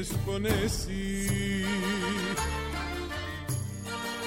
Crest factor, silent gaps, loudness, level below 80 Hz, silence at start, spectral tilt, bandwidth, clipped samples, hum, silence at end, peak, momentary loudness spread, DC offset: 16 dB; none; -31 LUFS; -40 dBFS; 0 s; -4.5 dB/octave; 16.5 kHz; under 0.1%; none; 0 s; -14 dBFS; 6 LU; under 0.1%